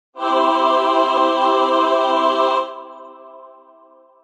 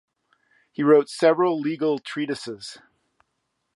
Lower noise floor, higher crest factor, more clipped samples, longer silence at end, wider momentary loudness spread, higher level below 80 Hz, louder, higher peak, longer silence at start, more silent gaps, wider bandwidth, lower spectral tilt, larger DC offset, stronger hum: second, -49 dBFS vs -76 dBFS; second, 14 dB vs 20 dB; neither; second, 0.75 s vs 1 s; second, 8 LU vs 18 LU; about the same, -76 dBFS vs -76 dBFS; first, -16 LUFS vs -22 LUFS; about the same, -4 dBFS vs -4 dBFS; second, 0.15 s vs 0.8 s; neither; second, 10 kHz vs 11.5 kHz; second, -2 dB/octave vs -5.5 dB/octave; neither; neither